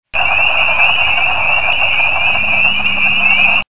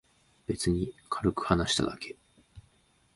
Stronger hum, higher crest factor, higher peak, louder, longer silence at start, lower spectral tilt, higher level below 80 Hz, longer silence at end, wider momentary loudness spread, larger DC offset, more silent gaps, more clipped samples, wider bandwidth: neither; second, 12 dB vs 24 dB; first, 0 dBFS vs -8 dBFS; first, -10 LUFS vs -30 LUFS; second, 0 s vs 0.5 s; first, -6.5 dB/octave vs -4.5 dB/octave; first, -38 dBFS vs -48 dBFS; second, 0.05 s vs 0.55 s; second, 3 LU vs 17 LU; first, 10% vs under 0.1%; neither; neither; second, 4 kHz vs 11.5 kHz